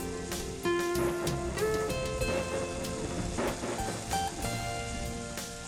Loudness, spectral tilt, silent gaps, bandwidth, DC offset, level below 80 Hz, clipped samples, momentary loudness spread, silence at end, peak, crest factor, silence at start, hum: -33 LUFS; -4.5 dB/octave; none; 17.5 kHz; under 0.1%; -44 dBFS; under 0.1%; 6 LU; 0 s; -16 dBFS; 16 dB; 0 s; none